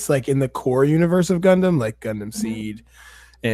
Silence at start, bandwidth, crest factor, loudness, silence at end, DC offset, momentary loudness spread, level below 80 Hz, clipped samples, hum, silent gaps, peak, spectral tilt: 0 s; 15 kHz; 16 dB; -20 LUFS; 0 s; under 0.1%; 13 LU; -50 dBFS; under 0.1%; none; none; -4 dBFS; -6.5 dB/octave